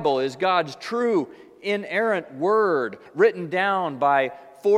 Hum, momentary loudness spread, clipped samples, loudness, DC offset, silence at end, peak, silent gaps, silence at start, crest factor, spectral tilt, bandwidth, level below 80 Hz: none; 8 LU; under 0.1%; -23 LUFS; under 0.1%; 0 s; -6 dBFS; none; 0 s; 16 dB; -5.5 dB/octave; 11.5 kHz; -76 dBFS